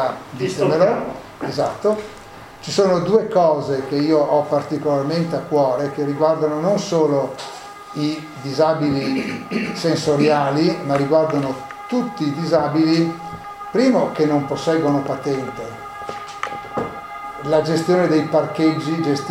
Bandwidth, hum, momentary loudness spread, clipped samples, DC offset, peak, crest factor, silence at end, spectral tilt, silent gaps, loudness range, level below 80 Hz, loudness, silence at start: 15.5 kHz; none; 14 LU; under 0.1%; under 0.1%; -2 dBFS; 16 dB; 0 s; -6.5 dB/octave; none; 3 LU; -56 dBFS; -19 LUFS; 0 s